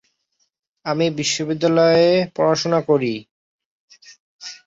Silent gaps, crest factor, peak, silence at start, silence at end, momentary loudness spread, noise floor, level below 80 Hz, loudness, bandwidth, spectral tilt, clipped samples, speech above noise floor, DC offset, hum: 3.31-3.59 s, 3.65-3.88 s, 4.20-4.39 s; 16 dB; -4 dBFS; 0.85 s; 0.15 s; 18 LU; -69 dBFS; -62 dBFS; -18 LUFS; 7.8 kHz; -5 dB/octave; under 0.1%; 52 dB; under 0.1%; none